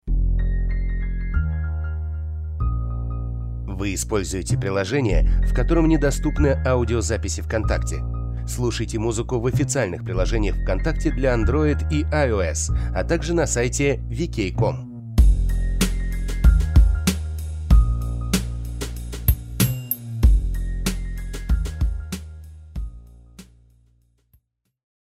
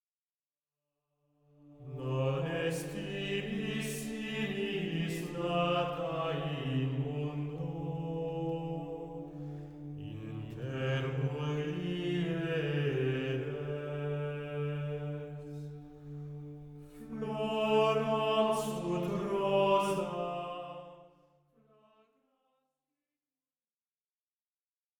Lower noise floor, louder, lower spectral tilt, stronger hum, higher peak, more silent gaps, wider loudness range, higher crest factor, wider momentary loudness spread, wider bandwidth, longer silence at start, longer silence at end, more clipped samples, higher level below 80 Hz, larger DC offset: second, -63 dBFS vs under -90 dBFS; first, -23 LUFS vs -35 LUFS; about the same, -5.5 dB/octave vs -6.5 dB/octave; neither; first, -6 dBFS vs -16 dBFS; neither; about the same, 6 LU vs 8 LU; about the same, 16 dB vs 20 dB; second, 11 LU vs 15 LU; second, 15.5 kHz vs 19.5 kHz; second, 0.05 s vs 1.6 s; second, 1.6 s vs 3.9 s; neither; first, -24 dBFS vs -64 dBFS; neither